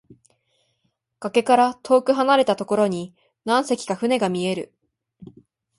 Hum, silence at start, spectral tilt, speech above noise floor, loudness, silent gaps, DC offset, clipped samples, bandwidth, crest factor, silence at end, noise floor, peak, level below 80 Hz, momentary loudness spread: none; 1.2 s; -5 dB/octave; 52 dB; -21 LUFS; none; under 0.1%; under 0.1%; 11.5 kHz; 18 dB; 0.55 s; -72 dBFS; -4 dBFS; -68 dBFS; 14 LU